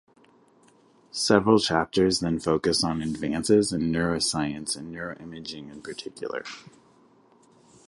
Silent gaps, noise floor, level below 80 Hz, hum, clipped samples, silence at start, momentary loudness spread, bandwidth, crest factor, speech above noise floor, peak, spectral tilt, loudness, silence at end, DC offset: none; -59 dBFS; -52 dBFS; none; under 0.1%; 1.15 s; 16 LU; 11.5 kHz; 24 dB; 34 dB; -4 dBFS; -4.5 dB/octave; -25 LUFS; 1.2 s; under 0.1%